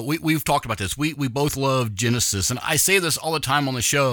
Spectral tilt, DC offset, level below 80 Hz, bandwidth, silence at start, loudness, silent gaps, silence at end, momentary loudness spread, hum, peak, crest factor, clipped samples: -3.5 dB/octave; under 0.1%; -46 dBFS; 19 kHz; 0 s; -21 LUFS; none; 0 s; 6 LU; none; -4 dBFS; 18 dB; under 0.1%